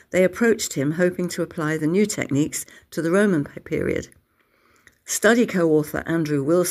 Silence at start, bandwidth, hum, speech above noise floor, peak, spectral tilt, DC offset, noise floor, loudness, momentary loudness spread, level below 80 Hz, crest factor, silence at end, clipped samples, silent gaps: 0.1 s; 16 kHz; none; 42 dB; -4 dBFS; -5 dB/octave; under 0.1%; -63 dBFS; -22 LUFS; 9 LU; -54 dBFS; 18 dB; 0 s; under 0.1%; none